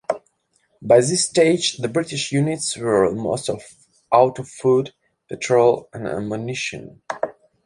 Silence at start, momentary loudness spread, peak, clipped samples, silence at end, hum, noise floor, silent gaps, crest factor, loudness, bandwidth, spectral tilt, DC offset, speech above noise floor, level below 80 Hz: 0.1 s; 13 LU; -2 dBFS; under 0.1%; 0.35 s; none; -65 dBFS; none; 20 dB; -20 LUFS; 11.5 kHz; -4.5 dB/octave; under 0.1%; 46 dB; -58 dBFS